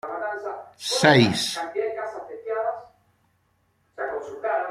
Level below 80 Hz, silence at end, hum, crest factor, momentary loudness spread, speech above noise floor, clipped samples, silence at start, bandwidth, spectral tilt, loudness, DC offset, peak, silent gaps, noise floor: -62 dBFS; 0 s; none; 24 dB; 17 LU; 46 dB; under 0.1%; 0.05 s; 15.5 kHz; -4.5 dB/octave; -24 LUFS; under 0.1%; -2 dBFS; none; -67 dBFS